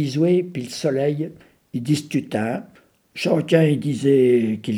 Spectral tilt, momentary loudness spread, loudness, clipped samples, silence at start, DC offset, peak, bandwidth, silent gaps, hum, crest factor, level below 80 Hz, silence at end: -7 dB/octave; 13 LU; -20 LUFS; under 0.1%; 0 s; under 0.1%; -2 dBFS; 15.5 kHz; none; none; 18 dB; -68 dBFS; 0 s